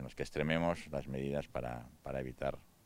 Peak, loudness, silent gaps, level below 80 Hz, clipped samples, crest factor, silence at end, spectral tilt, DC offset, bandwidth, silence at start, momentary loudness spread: -18 dBFS; -39 LUFS; none; -56 dBFS; under 0.1%; 22 dB; 0.2 s; -6.5 dB/octave; under 0.1%; 16 kHz; 0 s; 9 LU